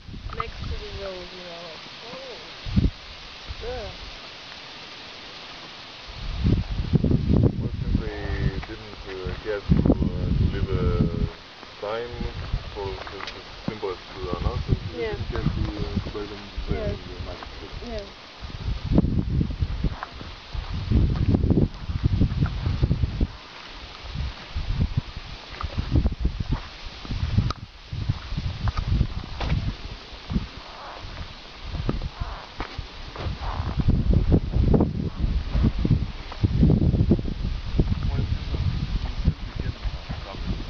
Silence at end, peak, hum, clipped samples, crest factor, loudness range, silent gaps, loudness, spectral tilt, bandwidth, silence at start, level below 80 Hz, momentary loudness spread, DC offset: 0 s; -4 dBFS; none; under 0.1%; 20 dB; 8 LU; none; -27 LUFS; -8 dB/octave; 6.6 kHz; 0 s; -30 dBFS; 16 LU; 0.1%